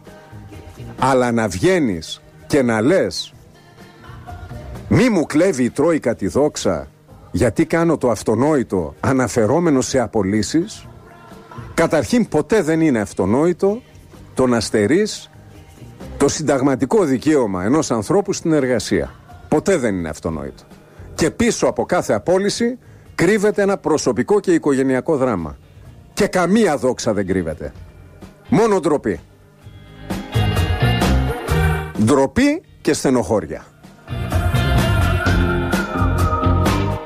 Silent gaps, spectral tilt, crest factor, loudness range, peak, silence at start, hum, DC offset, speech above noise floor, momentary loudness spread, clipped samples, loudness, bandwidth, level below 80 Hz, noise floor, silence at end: none; -6 dB/octave; 14 dB; 3 LU; -4 dBFS; 0.05 s; none; under 0.1%; 27 dB; 14 LU; under 0.1%; -18 LUFS; 15.5 kHz; -32 dBFS; -43 dBFS; 0 s